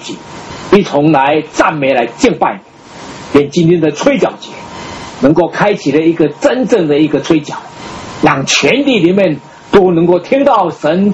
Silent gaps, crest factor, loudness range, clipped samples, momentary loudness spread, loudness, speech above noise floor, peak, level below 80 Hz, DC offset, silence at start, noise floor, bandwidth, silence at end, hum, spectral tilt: none; 12 dB; 2 LU; 0.4%; 17 LU; -11 LUFS; 20 dB; 0 dBFS; -44 dBFS; under 0.1%; 0 s; -30 dBFS; 8.4 kHz; 0 s; none; -5.5 dB/octave